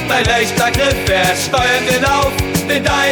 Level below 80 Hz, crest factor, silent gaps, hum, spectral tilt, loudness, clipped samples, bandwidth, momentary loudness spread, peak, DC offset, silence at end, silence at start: -30 dBFS; 12 dB; none; none; -3.5 dB/octave; -13 LUFS; under 0.1%; over 20 kHz; 2 LU; -2 dBFS; under 0.1%; 0 s; 0 s